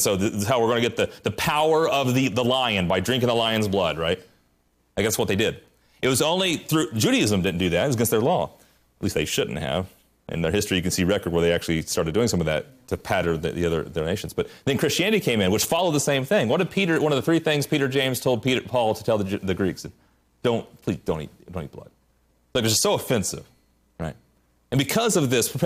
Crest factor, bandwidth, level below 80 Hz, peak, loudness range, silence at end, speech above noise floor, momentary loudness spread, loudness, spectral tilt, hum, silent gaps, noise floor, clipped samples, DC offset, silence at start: 14 dB; 15.5 kHz; -52 dBFS; -10 dBFS; 5 LU; 0 s; 43 dB; 9 LU; -23 LUFS; -4.5 dB/octave; none; none; -65 dBFS; under 0.1%; under 0.1%; 0 s